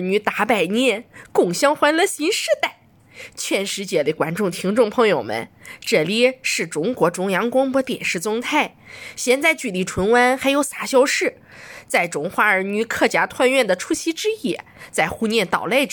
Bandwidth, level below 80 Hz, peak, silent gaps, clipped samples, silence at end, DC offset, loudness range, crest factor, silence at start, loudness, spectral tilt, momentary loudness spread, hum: 17.5 kHz; -56 dBFS; -2 dBFS; none; under 0.1%; 0 s; under 0.1%; 2 LU; 18 dB; 0 s; -19 LUFS; -3.5 dB/octave; 10 LU; none